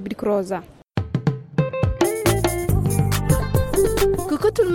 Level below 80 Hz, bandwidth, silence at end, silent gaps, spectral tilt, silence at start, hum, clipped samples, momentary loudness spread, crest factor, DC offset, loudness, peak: -32 dBFS; 17 kHz; 0 s; none; -6 dB/octave; 0 s; none; under 0.1%; 7 LU; 18 dB; under 0.1%; -21 LUFS; -4 dBFS